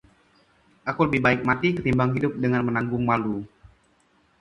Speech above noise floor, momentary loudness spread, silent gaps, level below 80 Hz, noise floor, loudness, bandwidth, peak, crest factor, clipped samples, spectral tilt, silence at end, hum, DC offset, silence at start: 40 dB; 11 LU; none; -50 dBFS; -63 dBFS; -23 LUFS; 7.2 kHz; -6 dBFS; 20 dB; under 0.1%; -8 dB/octave; 0.95 s; none; under 0.1%; 0.85 s